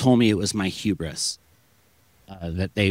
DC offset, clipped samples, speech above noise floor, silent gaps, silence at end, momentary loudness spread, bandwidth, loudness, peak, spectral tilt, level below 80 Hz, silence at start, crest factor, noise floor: under 0.1%; under 0.1%; 38 dB; none; 0 s; 15 LU; 16 kHz; -24 LUFS; -6 dBFS; -5 dB/octave; -52 dBFS; 0 s; 18 dB; -61 dBFS